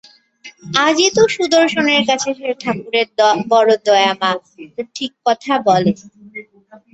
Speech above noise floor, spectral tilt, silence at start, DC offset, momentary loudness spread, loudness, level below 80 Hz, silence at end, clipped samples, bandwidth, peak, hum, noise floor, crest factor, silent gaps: 31 dB; -3.5 dB/octave; 0.45 s; under 0.1%; 16 LU; -15 LUFS; -60 dBFS; 0.15 s; under 0.1%; 8.2 kHz; -2 dBFS; none; -46 dBFS; 16 dB; none